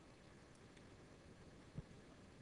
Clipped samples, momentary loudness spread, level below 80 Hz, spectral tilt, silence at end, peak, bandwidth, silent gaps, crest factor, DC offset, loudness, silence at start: under 0.1%; 6 LU; -70 dBFS; -5.5 dB/octave; 0 s; -40 dBFS; 10.5 kHz; none; 20 dB; under 0.1%; -61 LUFS; 0 s